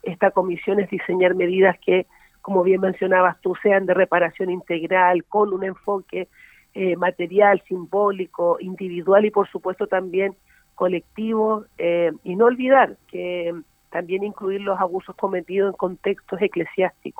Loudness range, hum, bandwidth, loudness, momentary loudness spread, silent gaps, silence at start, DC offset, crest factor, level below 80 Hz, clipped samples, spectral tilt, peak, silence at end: 4 LU; none; 3.8 kHz; -21 LUFS; 10 LU; none; 0.05 s; under 0.1%; 18 dB; -64 dBFS; under 0.1%; -8 dB/octave; -2 dBFS; 0.1 s